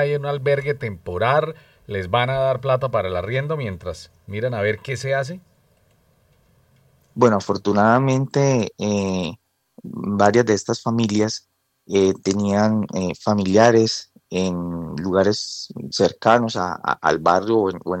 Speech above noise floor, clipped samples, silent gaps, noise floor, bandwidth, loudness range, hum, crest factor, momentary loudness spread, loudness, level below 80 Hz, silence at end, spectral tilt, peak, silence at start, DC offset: 40 dB; under 0.1%; none; -60 dBFS; 11 kHz; 5 LU; none; 20 dB; 13 LU; -20 LUFS; -56 dBFS; 0 s; -5.5 dB/octave; -2 dBFS; 0 s; under 0.1%